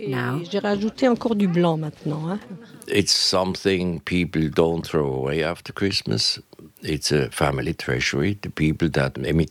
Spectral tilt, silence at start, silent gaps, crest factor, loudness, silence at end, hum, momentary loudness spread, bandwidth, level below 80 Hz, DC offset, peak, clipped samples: -5 dB/octave; 0 s; none; 18 dB; -22 LUFS; 0 s; none; 8 LU; 16 kHz; -44 dBFS; under 0.1%; -4 dBFS; under 0.1%